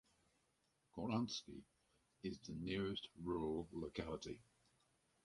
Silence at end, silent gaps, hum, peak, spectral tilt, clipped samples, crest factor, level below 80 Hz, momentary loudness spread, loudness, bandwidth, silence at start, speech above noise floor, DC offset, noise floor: 0.8 s; none; none; -30 dBFS; -5.5 dB/octave; under 0.1%; 18 dB; -66 dBFS; 13 LU; -46 LUFS; 11.5 kHz; 0.95 s; 37 dB; under 0.1%; -83 dBFS